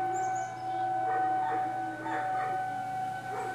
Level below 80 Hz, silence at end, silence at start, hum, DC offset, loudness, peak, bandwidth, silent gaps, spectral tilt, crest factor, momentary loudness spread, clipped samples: -74 dBFS; 0 s; 0 s; none; under 0.1%; -32 LUFS; -22 dBFS; 13 kHz; none; -4.5 dB/octave; 10 dB; 6 LU; under 0.1%